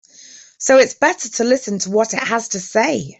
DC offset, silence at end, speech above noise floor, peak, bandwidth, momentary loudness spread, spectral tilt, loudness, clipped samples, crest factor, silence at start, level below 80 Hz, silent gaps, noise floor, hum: under 0.1%; 0.05 s; 26 dB; -2 dBFS; 8.2 kHz; 7 LU; -3 dB/octave; -17 LUFS; under 0.1%; 16 dB; 0.6 s; -62 dBFS; none; -43 dBFS; none